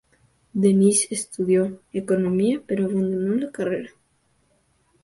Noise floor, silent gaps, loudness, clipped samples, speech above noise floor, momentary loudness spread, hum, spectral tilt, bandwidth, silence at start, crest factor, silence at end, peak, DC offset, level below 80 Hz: -65 dBFS; none; -22 LUFS; under 0.1%; 44 dB; 11 LU; none; -5.5 dB/octave; 11.5 kHz; 0.55 s; 16 dB; 1.15 s; -6 dBFS; under 0.1%; -62 dBFS